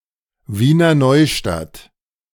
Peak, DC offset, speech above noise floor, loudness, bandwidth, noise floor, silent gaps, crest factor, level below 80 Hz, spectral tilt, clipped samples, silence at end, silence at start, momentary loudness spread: -2 dBFS; under 0.1%; 27 dB; -14 LUFS; 18 kHz; -41 dBFS; none; 14 dB; -42 dBFS; -6 dB/octave; under 0.1%; 0.55 s; 0.5 s; 15 LU